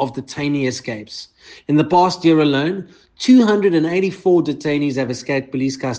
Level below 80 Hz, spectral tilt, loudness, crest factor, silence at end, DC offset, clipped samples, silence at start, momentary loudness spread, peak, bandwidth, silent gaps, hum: -58 dBFS; -6 dB/octave; -17 LUFS; 16 dB; 0 s; under 0.1%; under 0.1%; 0 s; 14 LU; -2 dBFS; 9.2 kHz; none; none